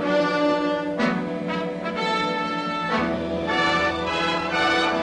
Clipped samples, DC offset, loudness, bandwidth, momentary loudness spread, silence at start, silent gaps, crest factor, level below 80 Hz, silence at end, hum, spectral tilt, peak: under 0.1%; under 0.1%; -23 LUFS; 11 kHz; 7 LU; 0 s; none; 14 dB; -52 dBFS; 0 s; none; -5 dB/octave; -10 dBFS